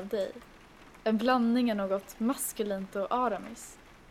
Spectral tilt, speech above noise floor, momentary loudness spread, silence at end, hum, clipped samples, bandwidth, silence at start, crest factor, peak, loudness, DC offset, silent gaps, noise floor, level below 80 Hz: -4.5 dB/octave; 23 dB; 16 LU; 0.15 s; none; under 0.1%; 16 kHz; 0 s; 18 dB; -12 dBFS; -31 LUFS; under 0.1%; none; -54 dBFS; -62 dBFS